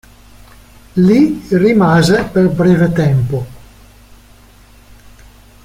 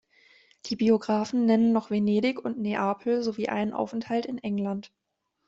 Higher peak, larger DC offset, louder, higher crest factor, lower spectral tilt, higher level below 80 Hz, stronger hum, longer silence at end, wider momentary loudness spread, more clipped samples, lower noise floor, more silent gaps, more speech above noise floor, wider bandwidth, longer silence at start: first, -2 dBFS vs -10 dBFS; neither; first, -12 LUFS vs -27 LUFS; about the same, 12 dB vs 16 dB; about the same, -7.5 dB/octave vs -6.5 dB/octave; first, -40 dBFS vs -68 dBFS; neither; first, 2.05 s vs 0.6 s; about the same, 10 LU vs 9 LU; neither; second, -43 dBFS vs -60 dBFS; neither; about the same, 32 dB vs 34 dB; first, 15.5 kHz vs 7.8 kHz; first, 0.95 s vs 0.65 s